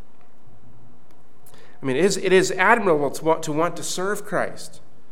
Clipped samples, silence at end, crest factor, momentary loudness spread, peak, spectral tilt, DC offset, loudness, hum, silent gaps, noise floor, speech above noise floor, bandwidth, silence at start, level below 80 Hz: under 0.1%; 0.35 s; 22 dB; 13 LU; -2 dBFS; -4 dB/octave; 4%; -21 LUFS; none; none; -55 dBFS; 34 dB; 16.5 kHz; 1.8 s; -66 dBFS